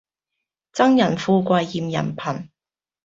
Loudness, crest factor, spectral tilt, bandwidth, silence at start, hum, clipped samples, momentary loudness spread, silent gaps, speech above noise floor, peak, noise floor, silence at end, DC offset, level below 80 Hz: -20 LUFS; 20 dB; -6.5 dB/octave; 7.8 kHz; 0.75 s; none; under 0.1%; 13 LU; none; over 71 dB; -2 dBFS; under -90 dBFS; 0.6 s; under 0.1%; -60 dBFS